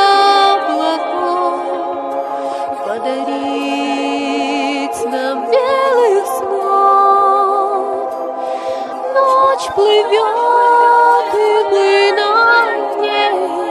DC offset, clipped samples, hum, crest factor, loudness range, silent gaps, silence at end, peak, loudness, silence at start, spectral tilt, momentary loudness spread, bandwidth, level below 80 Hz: under 0.1%; under 0.1%; none; 14 dB; 7 LU; none; 0 s; 0 dBFS; -14 LUFS; 0 s; -2.5 dB/octave; 11 LU; 13.5 kHz; -62 dBFS